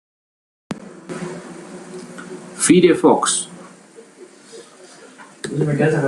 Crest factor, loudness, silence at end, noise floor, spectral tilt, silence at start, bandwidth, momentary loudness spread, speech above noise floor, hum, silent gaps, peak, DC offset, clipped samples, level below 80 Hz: 18 dB; -16 LUFS; 0 s; -44 dBFS; -4.5 dB/octave; 0.7 s; 12.5 kHz; 27 LU; 30 dB; none; none; -2 dBFS; under 0.1%; under 0.1%; -62 dBFS